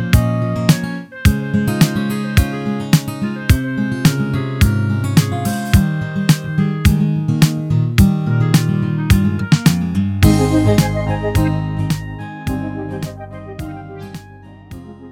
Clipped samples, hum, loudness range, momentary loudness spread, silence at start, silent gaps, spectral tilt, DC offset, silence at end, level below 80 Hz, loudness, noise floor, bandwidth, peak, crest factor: under 0.1%; none; 7 LU; 15 LU; 0 s; none; -6 dB/octave; under 0.1%; 0 s; -26 dBFS; -16 LUFS; -38 dBFS; 17.5 kHz; 0 dBFS; 16 dB